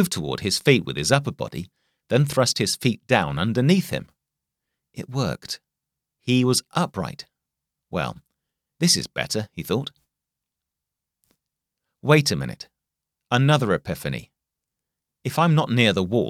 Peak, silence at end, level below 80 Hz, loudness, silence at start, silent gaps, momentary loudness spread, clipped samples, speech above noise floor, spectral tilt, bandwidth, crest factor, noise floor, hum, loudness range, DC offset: -2 dBFS; 0 s; -54 dBFS; -22 LUFS; 0 s; none; 15 LU; under 0.1%; 63 dB; -4.5 dB/octave; 16 kHz; 22 dB; -85 dBFS; none; 5 LU; under 0.1%